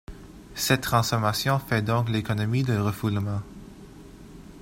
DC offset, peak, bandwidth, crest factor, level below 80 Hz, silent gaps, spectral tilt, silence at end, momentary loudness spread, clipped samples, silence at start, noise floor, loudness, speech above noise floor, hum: under 0.1%; -6 dBFS; 16 kHz; 20 dB; -50 dBFS; none; -5 dB/octave; 0 s; 23 LU; under 0.1%; 0.1 s; -45 dBFS; -25 LUFS; 21 dB; none